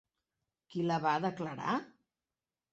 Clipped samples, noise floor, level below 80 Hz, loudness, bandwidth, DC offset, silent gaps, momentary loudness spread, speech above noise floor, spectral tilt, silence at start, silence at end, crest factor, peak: under 0.1%; under -90 dBFS; -78 dBFS; -35 LUFS; 8 kHz; under 0.1%; none; 7 LU; over 56 dB; -6.5 dB/octave; 0.7 s; 0.85 s; 20 dB; -18 dBFS